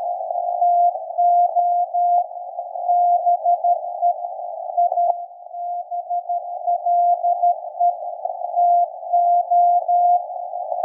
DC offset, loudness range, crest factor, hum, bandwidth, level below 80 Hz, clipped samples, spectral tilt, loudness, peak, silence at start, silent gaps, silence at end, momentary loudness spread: under 0.1%; 4 LU; 14 dB; none; 1 kHz; under -90 dBFS; under 0.1%; -6 dB/octave; -20 LUFS; -6 dBFS; 0 s; none; 0 s; 11 LU